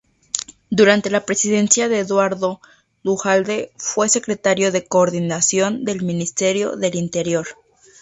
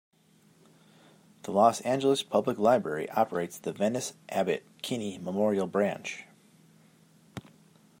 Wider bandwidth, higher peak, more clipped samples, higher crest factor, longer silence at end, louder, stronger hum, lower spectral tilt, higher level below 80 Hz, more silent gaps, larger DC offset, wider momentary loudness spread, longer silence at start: second, 8.2 kHz vs 16 kHz; first, 0 dBFS vs -10 dBFS; neither; about the same, 18 dB vs 22 dB; about the same, 0.5 s vs 0.6 s; first, -18 LUFS vs -29 LUFS; neither; second, -3.5 dB/octave vs -5 dB/octave; first, -60 dBFS vs -74 dBFS; neither; neither; second, 10 LU vs 17 LU; second, 0.35 s vs 1.45 s